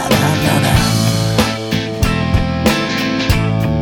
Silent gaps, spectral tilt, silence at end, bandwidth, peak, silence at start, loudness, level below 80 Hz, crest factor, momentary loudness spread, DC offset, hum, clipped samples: none; -5 dB/octave; 0 s; 19 kHz; 0 dBFS; 0 s; -15 LUFS; -26 dBFS; 14 dB; 4 LU; under 0.1%; none; under 0.1%